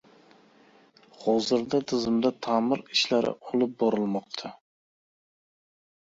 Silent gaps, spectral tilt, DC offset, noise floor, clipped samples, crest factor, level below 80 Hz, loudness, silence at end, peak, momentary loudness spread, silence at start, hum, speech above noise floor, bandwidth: none; -4.5 dB/octave; under 0.1%; -58 dBFS; under 0.1%; 18 dB; -68 dBFS; -27 LUFS; 1.5 s; -10 dBFS; 8 LU; 1.2 s; none; 32 dB; 7.8 kHz